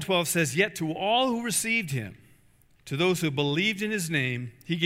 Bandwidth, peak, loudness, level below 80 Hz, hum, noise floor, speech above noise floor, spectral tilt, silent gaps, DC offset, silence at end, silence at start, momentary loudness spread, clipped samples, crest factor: 16 kHz; -8 dBFS; -26 LUFS; -64 dBFS; none; -60 dBFS; 33 dB; -4 dB/octave; none; under 0.1%; 0 s; 0 s; 9 LU; under 0.1%; 20 dB